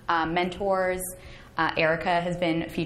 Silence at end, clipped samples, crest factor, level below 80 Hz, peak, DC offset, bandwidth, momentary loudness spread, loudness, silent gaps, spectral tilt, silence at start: 0 s; under 0.1%; 18 dB; -50 dBFS; -8 dBFS; under 0.1%; 14.5 kHz; 11 LU; -26 LUFS; none; -5 dB/octave; 0.05 s